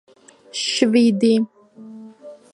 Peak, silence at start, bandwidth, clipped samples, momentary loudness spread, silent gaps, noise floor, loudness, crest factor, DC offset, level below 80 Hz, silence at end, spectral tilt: -2 dBFS; 0.55 s; 11.5 kHz; under 0.1%; 24 LU; none; -41 dBFS; -18 LUFS; 18 dB; under 0.1%; -72 dBFS; 0.2 s; -4.5 dB/octave